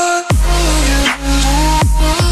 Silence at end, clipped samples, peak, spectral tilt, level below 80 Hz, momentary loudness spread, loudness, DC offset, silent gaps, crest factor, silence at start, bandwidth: 0 s; under 0.1%; -4 dBFS; -4 dB/octave; -14 dBFS; 2 LU; -13 LUFS; under 0.1%; none; 8 dB; 0 s; 13 kHz